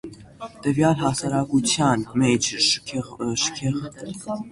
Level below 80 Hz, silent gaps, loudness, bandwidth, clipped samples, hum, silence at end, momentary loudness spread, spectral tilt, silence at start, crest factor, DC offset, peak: -52 dBFS; none; -22 LUFS; 11.5 kHz; under 0.1%; none; 0 s; 15 LU; -4 dB/octave; 0.05 s; 18 dB; under 0.1%; -6 dBFS